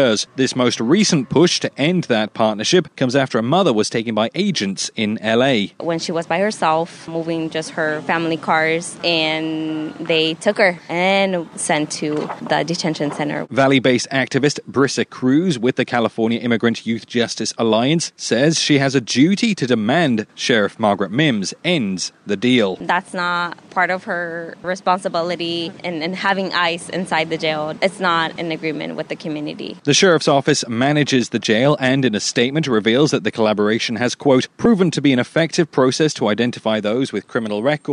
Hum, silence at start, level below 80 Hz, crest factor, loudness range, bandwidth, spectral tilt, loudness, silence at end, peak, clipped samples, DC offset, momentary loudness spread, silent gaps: none; 0 s; -60 dBFS; 16 dB; 4 LU; 11 kHz; -4.5 dB/octave; -18 LUFS; 0 s; -2 dBFS; under 0.1%; under 0.1%; 8 LU; none